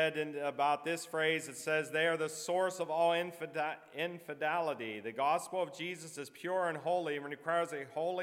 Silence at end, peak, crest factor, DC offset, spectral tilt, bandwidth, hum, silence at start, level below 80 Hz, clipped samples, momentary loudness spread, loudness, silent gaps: 0 s; -18 dBFS; 18 dB; under 0.1%; -3.5 dB/octave; 16.5 kHz; none; 0 s; under -90 dBFS; under 0.1%; 8 LU; -35 LUFS; none